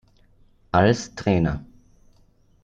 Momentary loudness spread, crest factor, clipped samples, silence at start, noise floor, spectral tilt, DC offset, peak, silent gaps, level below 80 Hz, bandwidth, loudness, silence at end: 7 LU; 20 dB; under 0.1%; 0.75 s; -58 dBFS; -6.5 dB/octave; under 0.1%; -4 dBFS; none; -44 dBFS; 8.8 kHz; -22 LUFS; 1 s